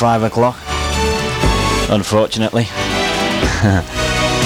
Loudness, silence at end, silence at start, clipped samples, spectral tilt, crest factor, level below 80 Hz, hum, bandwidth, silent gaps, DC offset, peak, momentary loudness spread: -16 LUFS; 0 s; 0 s; under 0.1%; -4.5 dB/octave; 14 dB; -26 dBFS; none; over 20 kHz; none; under 0.1%; -2 dBFS; 3 LU